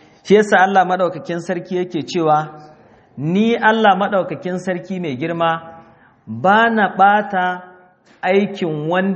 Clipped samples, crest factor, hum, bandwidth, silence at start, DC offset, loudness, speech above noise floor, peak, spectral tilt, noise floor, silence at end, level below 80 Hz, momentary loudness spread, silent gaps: under 0.1%; 16 dB; none; 8.2 kHz; 0.25 s; under 0.1%; -17 LUFS; 30 dB; 0 dBFS; -6 dB/octave; -46 dBFS; 0 s; -64 dBFS; 11 LU; none